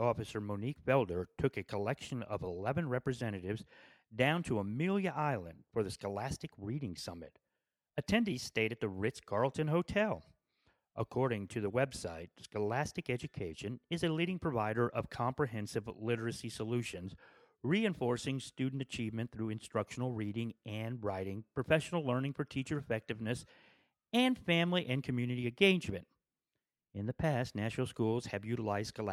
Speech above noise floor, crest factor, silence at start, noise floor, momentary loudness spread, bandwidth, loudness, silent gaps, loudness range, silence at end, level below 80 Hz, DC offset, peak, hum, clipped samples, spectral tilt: over 54 dB; 24 dB; 0 s; under -90 dBFS; 10 LU; 14.5 kHz; -36 LUFS; none; 4 LU; 0 s; -62 dBFS; under 0.1%; -12 dBFS; none; under 0.1%; -6 dB/octave